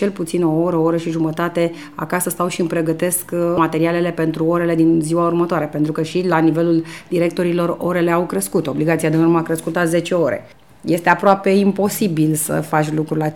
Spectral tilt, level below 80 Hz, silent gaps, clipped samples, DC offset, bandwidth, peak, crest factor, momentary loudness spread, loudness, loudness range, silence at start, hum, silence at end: -6 dB/octave; -54 dBFS; none; under 0.1%; 0.3%; 18 kHz; 0 dBFS; 18 dB; 5 LU; -17 LUFS; 2 LU; 0 s; none; 0 s